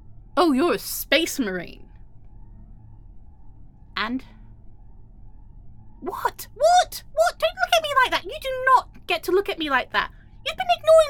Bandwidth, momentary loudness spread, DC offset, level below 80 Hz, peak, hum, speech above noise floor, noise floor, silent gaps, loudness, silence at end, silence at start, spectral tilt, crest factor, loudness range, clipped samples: 17.5 kHz; 13 LU; under 0.1%; -46 dBFS; -4 dBFS; none; 23 dB; -44 dBFS; none; -22 LUFS; 0 s; 0.1 s; -3 dB/octave; 20 dB; 15 LU; under 0.1%